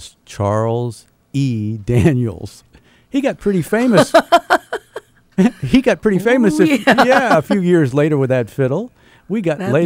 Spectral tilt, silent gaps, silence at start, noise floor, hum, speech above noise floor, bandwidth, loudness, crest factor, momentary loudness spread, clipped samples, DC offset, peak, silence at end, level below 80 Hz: -6.5 dB/octave; none; 0 s; -36 dBFS; none; 22 dB; 16 kHz; -15 LUFS; 14 dB; 14 LU; under 0.1%; under 0.1%; 0 dBFS; 0 s; -44 dBFS